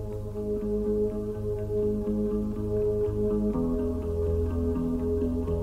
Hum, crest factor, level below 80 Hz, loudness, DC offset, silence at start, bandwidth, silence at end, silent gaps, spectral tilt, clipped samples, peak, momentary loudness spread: none; 12 dB; -36 dBFS; -29 LUFS; under 0.1%; 0 s; 14 kHz; 0 s; none; -10 dB/octave; under 0.1%; -16 dBFS; 5 LU